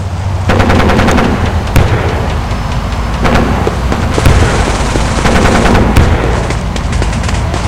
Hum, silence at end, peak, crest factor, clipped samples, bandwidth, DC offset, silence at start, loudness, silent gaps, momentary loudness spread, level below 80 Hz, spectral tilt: none; 0 s; 0 dBFS; 10 dB; 0.5%; 16.5 kHz; under 0.1%; 0 s; -11 LUFS; none; 7 LU; -14 dBFS; -5.5 dB/octave